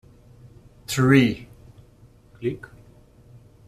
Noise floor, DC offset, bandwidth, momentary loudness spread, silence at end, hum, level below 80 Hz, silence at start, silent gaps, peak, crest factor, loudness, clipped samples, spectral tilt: -52 dBFS; under 0.1%; 14.5 kHz; 24 LU; 1.1 s; none; -54 dBFS; 0.9 s; none; -4 dBFS; 22 dB; -21 LUFS; under 0.1%; -6 dB/octave